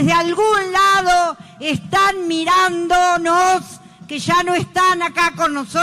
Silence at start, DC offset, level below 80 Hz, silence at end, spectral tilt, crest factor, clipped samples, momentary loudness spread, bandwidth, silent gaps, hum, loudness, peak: 0 s; under 0.1%; -46 dBFS; 0 s; -3.5 dB/octave; 12 dB; under 0.1%; 9 LU; 15 kHz; none; none; -16 LUFS; -4 dBFS